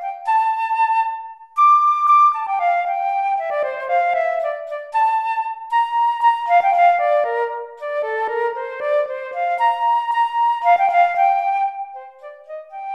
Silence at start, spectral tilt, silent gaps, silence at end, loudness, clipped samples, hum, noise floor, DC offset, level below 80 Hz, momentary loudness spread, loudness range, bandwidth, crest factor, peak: 0 s; -1 dB/octave; none; 0 s; -18 LUFS; under 0.1%; none; -39 dBFS; under 0.1%; -74 dBFS; 12 LU; 4 LU; 11 kHz; 14 dB; -4 dBFS